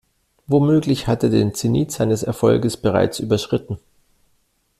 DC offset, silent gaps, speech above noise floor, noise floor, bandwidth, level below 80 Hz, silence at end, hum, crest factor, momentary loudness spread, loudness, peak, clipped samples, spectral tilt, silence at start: under 0.1%; none; 46 dB; -64 dBFS; 14.5 kHz; -48 dBFS; 1 s; none; 16 dB; 6 LU; -19 LUFS; -2 dBFS; under 0.1%; -6.5 dB/octave; 0.5 s